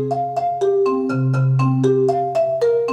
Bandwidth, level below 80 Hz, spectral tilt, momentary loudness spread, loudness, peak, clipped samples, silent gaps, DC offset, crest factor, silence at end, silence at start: 8.6 kHz; -62 dBFS; -9 dB/octave; 4 LU; -18 LUFS; -6 dBFS; under 0.1%; none; under 0.1%; 12 dB; 0 s; 0 s